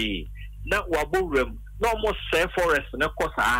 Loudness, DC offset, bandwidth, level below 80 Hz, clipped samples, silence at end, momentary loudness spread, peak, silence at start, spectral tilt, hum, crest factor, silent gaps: -25 LUFS; under 0.1%; 16 kHz; -38 dBFS; under 0.1%; 0 s; 8 LU; -10 dBFS; 0 s; -4 dB/octave; none; 14 dB; none